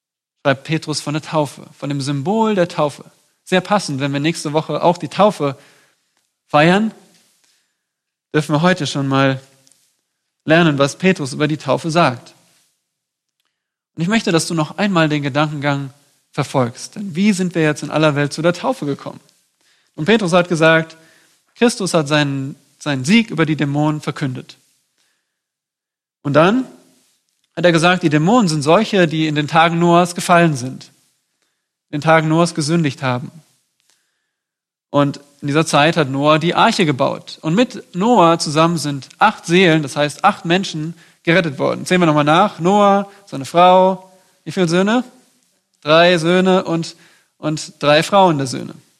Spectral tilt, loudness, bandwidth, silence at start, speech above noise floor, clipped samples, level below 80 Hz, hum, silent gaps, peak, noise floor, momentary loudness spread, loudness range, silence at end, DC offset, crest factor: -5.5 dB/octave; -16 LUFS; 13 kHz; 0.45 s; 71 dB; under 0.1%; -60 dBFS; none; none; 0 dBFS; -87 dBFS; 13 LU; 6 LU; 0.25 s; under 0.1%; 16 dB